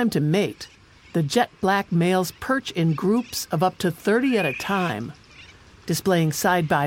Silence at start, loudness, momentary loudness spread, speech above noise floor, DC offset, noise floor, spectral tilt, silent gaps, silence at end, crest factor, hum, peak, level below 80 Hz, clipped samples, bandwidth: 0 s; -23 LUFS; 8 LU; 25 dB; under 0.1%; -47 dBFS; -5.5 dB/octave; none; 0 s; 16 dB; none; -6 dBFS; -56 dBFS; under 0.1%; 17 kHz